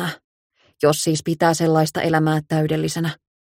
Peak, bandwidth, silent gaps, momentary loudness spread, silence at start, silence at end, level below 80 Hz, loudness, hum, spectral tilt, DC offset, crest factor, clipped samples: -4 dBFS; 16.5 kHz; 0.24-0.50 s; 10 LU; 0 s; 0.4 s; -56 dBFS; -20 LUFS; none; -5.5 dB/octave; under 0.1%; 18 dB; under 0.1%